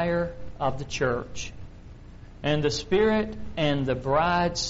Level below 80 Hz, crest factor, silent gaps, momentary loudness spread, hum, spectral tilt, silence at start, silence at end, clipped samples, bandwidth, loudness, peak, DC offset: -44 dBFS; 16 dB; none; 15 LU; none; -4.5 dB/octave; 0 s; 0 s; under 0.1%; 8 kHz; -26 LUFS; -10 dBFS; under 0.1%